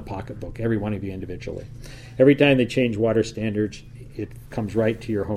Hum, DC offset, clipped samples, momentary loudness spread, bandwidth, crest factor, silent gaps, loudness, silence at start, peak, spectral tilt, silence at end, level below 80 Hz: none; under 0.1%; under 0.1%; 19 LU; 13.5 kHz; 20 dB; none; -22 LUFS; 0 s; -4 dBFS; -7 dB/octave; 0 s; -44 dBFS